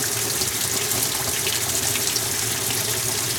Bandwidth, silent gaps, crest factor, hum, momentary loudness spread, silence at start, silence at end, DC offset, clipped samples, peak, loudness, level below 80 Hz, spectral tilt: over 20 kHz; none; 20 dB; none; 1 LU; 0 s; 0 s; under 0.1%; under 0.1%; -4 dBFS; -21 LUFS; -50 dBFS; -1 dB/octave